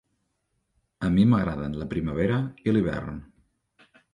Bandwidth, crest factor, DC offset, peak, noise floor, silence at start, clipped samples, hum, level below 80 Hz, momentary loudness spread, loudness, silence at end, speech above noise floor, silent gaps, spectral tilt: 10 kHz; 18 dB; under 0.1%; -8 dBFS; -76 dBFS; 1 s; under 0.1%; none; -46 dBFS; 12 LU; -25 LUFS; 0.9 s; 51 dB; none; -9 dB/octave